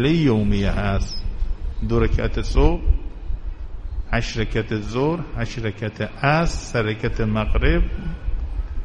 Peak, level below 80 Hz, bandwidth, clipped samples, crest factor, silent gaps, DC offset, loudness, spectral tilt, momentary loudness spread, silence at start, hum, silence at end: -2 dBFS; -24 dBFS; 9.4 kHz; under 0.1%; 18 dB; none; under 0.1%; -23 LUFS; -6.5 dB/octave; 11 LU; 0 s; none; 0 s